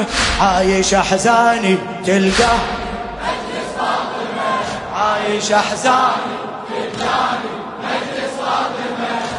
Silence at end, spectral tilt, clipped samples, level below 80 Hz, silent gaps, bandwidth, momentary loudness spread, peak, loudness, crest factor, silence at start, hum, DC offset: 0 s; -3.5 dB/octave; under 0.1%; -36 dBFS; none; 11 kHz; 11 LU; 0 dBFS; -17 LUFS; 16 dB; 0 s; none; under 0.1%